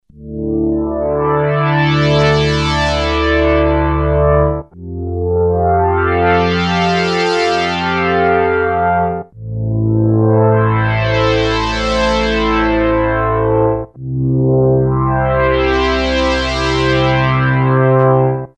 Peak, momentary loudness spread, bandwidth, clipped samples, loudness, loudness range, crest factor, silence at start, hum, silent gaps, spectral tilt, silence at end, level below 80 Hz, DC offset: 0 dBFS; 6 LU; 9.4 kHz; under 0.1%; -14 LUFS; 1 LU; 14 dB; 0.15 s; none; none; -6.5 dB/octave; 0.1 s; -26 dBFS; under 0.1%